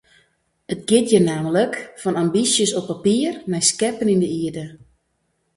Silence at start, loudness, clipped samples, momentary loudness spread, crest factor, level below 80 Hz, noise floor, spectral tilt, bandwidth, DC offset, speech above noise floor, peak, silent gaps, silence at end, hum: 0.7 s; -19 LUFS; under 0.1%; 11 LU; 20 dB; -58 dBFS; -70 dBFS; -4 dB/octave; 11.5 kHz; under 0.1%; 50 dB; -2 dBFS; none; 0.8 s; none